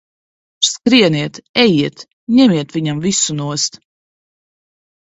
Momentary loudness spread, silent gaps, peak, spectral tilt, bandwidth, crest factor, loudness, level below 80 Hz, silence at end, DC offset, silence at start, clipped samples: 9 LU; 1.49-1.54 s, 2.13-2.27 s; 0 dBFS; -4 dB/octave; 8.4 kHz; 16 dB; -14 LUFS; -56 dBFS; 1.3 s; under 0.1%; 0.6 s; under 0.1%